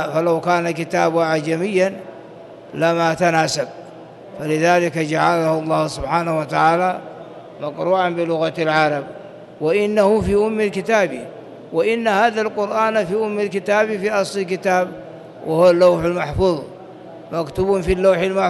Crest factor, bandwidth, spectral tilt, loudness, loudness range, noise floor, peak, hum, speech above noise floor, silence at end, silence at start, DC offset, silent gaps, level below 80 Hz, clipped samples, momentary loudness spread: 14 dB; 12.5 kHz; -5.5 dB/octave; -18 LUFS; 2 LU; -38 dBFS; -4 dBFS; none; 21 dB; 0 s; 0 s; under 0.1%; none; -44 dBFS; under 0.1%; 20 LU